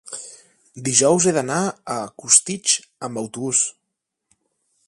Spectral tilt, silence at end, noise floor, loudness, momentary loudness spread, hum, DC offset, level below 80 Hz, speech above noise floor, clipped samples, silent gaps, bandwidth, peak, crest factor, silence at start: -2.5 dB/octave; 1.15 s; -79 dBFS; -19 LUFS; 15 LU; none; under 0.1%; -64 dBFS; 59 dB; under 0.1%; none; 11.5 kHz; 0 dBFS; 22 dB; 0.05 s